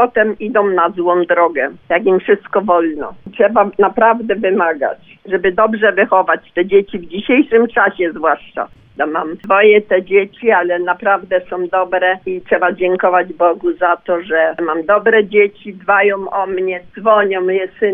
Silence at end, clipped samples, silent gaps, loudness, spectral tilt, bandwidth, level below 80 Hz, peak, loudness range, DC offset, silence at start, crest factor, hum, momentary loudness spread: 0 s; under 0.1%; none; -14 LUFS; -9 dB/octave; 3.8 kHz; -52 dBFS; 0 dBFS; 1 LU; under 0.1%; 0 s; 14 dB; none; 9 LU